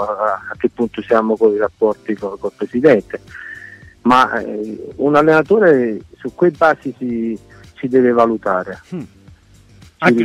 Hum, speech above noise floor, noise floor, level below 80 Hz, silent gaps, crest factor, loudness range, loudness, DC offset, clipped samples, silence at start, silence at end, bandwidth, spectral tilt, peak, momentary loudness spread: none; 30 dB; -45 dBFS; -52 dBFS; none; 14 dB; 3 LU; -16 LUFS; under 0.1%; under 0.1%; 0 s; 0 s; 11.5 kHz; -7 dB/octave; -2 dBFS; 18 LU